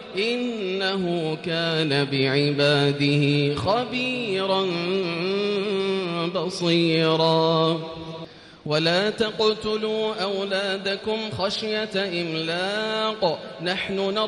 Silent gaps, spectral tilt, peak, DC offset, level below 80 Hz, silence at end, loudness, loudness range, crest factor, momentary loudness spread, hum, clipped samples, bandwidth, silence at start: none; -5.5 dB/octave; -8 dBFS; under 0.1%; -60 dBFS; 0 s; -23 LUFS; 3 LU; 16 dB; 7 LU; none; under 0.1%; 11.5 kHz; 0 s